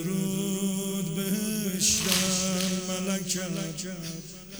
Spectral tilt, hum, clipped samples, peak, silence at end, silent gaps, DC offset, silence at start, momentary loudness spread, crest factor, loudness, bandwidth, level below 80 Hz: -3.5 dB/octave; none; under 0.1%; -6 dBFS; 0 s; none; under 0.1%; 0 s; 12 LU; 22 dB; -27 LUFS; over 20 kHz; -54 dBFS